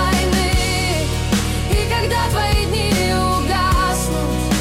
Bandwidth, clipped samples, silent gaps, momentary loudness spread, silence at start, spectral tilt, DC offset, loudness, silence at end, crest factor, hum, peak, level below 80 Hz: 16.5 kHz; under 0.1%; none; 3 LU; 0 s; -4.5 dB/octave; under 0.1%; -18 LUFS; 0 s; 10 dB; none; -6 dBFS; -24 dBFS